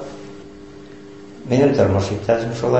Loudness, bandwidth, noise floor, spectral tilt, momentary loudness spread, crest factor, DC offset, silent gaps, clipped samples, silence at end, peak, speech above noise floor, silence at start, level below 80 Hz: -18 LUFS; 8.4 kHz; -39 dBFS; -7 dB/octave; 24 LU; 18 dB; 0.4%; none; under 0.1%; 0 s; -2 dBFS; 22 dB; 0 s; -40 dBFS